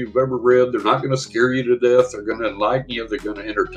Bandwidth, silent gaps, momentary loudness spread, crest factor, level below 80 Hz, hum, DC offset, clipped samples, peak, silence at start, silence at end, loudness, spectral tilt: 9.4 kHz; none; 9 LU; 18 dB; -48 dBFS; none; under 0.1%; under 0.1%; -2 dBFS; 0 s; 0 s; -19 LUFS; -5.5 dB/octave